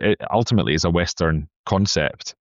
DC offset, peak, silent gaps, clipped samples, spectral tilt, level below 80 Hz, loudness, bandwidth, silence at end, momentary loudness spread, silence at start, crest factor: under 0.1%; -4 dBFS; 1.56-1.64 s; under 0.1%; -5 dB/octave; -38 dBFS; -21 LUFS; 7.8 kHz; 0.1 s; 5 LU; 0 s; 16 dB